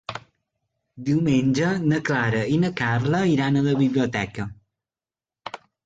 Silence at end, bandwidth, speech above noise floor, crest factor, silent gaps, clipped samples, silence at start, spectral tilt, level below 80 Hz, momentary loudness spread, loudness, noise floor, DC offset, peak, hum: 0.3 s; 7.8 kHz; over 69 dB; 16 dB; none; under 0.1%; 0.1 s; -7 dB/octave; -54 dBFS; 17 LU; -22 LUFS; under -90 dBFS; under 0.1%; -8 dBFS; none